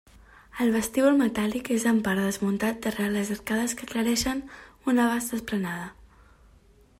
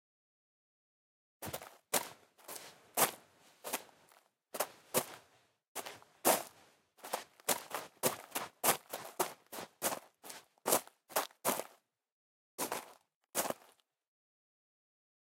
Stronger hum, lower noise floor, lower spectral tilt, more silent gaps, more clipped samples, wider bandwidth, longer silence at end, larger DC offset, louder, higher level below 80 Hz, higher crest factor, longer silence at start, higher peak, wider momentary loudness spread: neither; second, -57 dBFS vs -70 dBFS; first, -4.5 dB/octave vs -1.5 dB/octave; second, none vs 5.68-5.75 s, 12.12-12.58 s, 13.16-13.21 s; neither; about the same, 16 kHz vs 17 kHz; second, 1.05 s vs 1.7 s; neither; first, -26 LUFS vs -37 LUFS; first, -54 dBFS vs -82 dBFS; second, 16 dB vs 30 dB; second, 0.55 s vs 1.4 s; about the same, -10 dBFS vs -12 dBFS; second, 11 LU vs 18 LU